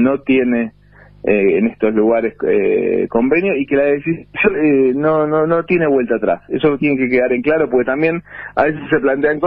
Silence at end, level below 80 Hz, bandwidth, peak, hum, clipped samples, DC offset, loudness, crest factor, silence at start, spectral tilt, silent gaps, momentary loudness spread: 0 s; -48 dBFS; 4.8 kHz; 0 dBFS; none; under 0.1%; under 0.1%; -15 LUFS; 14 dB; 0 s; -10.5 dB/octave; none; 4 LU